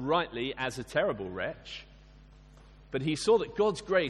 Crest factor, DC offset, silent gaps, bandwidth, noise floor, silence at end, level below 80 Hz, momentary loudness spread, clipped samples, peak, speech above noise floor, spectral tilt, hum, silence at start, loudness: 18 dB; under 0.1%; none; 12 kHz; -54 dBFS; 0 s; -56 dBFS; 13 LU; under 0.1%; -12 dBFS; 24 dB; -5 dB/octave; none; 0 s; -31 LUFS